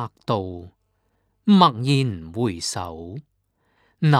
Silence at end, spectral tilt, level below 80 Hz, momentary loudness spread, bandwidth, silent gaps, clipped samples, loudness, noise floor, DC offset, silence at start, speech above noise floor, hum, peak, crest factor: 0 s; -6 dB/octave; -54 dBFS; 21 LU; 13 kHz; none; under 0.1%; -21 LUFS; -69 dBFS; under 0.1%; 0 s; 47 dB; none; 0 dBFS; 22 dB